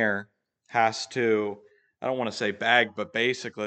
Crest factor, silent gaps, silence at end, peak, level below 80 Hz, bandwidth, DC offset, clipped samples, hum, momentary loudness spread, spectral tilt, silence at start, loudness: 22 dB; none; 0 s; -6 dBFS; -78 dBFS; 9 kHz; under 0.1%; under 0.1%; none; 11 LU; -4 dB/octave; 0 s; -26 LUFS